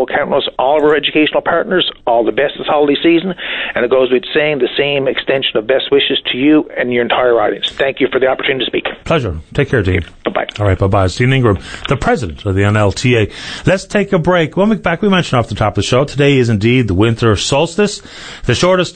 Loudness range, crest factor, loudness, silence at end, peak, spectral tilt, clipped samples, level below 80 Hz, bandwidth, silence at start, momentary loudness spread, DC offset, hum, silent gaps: 2 LU; 12 dB; -13 LUFS; 0.05 s; 0 dBFS; -5.5 dB/octave; under 0.1%; -36 dBFS; 9.4 kHz; 0 s; 6 LU; under 0.1%; none; none